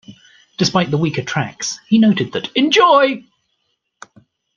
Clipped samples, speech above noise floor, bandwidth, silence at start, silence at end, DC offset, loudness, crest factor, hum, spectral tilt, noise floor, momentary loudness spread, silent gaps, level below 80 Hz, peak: under 0.1%; 54 dB; 7.4 kHz; 0.1 s; 1.35 s; under 0.1%; -15 LUFS; 16 dB; none; -4.5 dB/octave; -69 dBFS; 12 LU; none; -58 dBFS; 0 dBFS